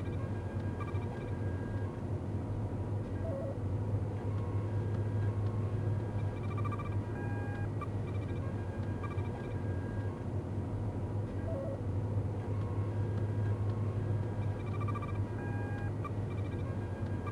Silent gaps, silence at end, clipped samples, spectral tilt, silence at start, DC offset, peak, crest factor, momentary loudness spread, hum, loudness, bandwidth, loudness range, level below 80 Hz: none; 0 s; under 0.1%; -9 dB/octave; 0 s; under 0.1%; -24 dBFS; 12 dB; 3 LU; none; -37 LUFS; 6.8 kHz; 2 LU; -50 dBFS